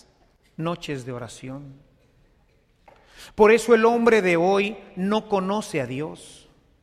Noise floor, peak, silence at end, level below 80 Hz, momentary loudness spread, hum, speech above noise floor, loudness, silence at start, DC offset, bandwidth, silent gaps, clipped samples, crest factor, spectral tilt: -61 dBFS; -4 dBFS; 0.55 s; -56 dBFS; 20 LU; none; 39 dB; -21 LUFS; 0.6 s; under 0.1%; 14 kHz; none; under 0.1%; 20 dB; -5.5 dB/octave